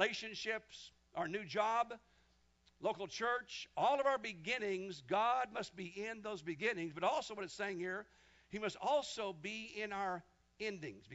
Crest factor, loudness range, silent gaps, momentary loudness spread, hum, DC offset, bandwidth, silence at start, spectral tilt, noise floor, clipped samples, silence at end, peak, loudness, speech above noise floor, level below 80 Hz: 22 dB; 4 LU; none; 10 LU; none; under 0.1%; 7.6 kHz; 0 s; -2 dB/octave; -73 dBFS; under 0.1%; 0 s; -20 dBFS; -40 LUFS; 33 dB; -76 dBFS